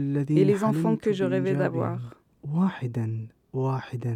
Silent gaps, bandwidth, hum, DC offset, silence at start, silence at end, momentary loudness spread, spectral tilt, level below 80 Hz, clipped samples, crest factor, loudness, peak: none; 13 kHz; none; under 0.1%; 0 s; 0 s; 14 LU; -8.5 dB/octave; -66 dBFS; under 0.1%; 18 dB; -26 LUFS; -8 dBFS